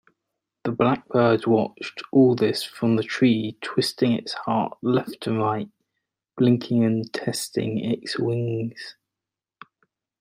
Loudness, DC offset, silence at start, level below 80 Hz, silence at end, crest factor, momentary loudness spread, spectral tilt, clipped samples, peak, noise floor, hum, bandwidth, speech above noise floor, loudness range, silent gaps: -23 LUFS; under 0.1%; 0.65 s; -66 dBFS; 1.3 s; 18 dB; 11 LU; -6 dB/octave; under 0.1%; -6 dBFS; -88 dBFS; none; 16 kHz; 65 dB; 4 LU; none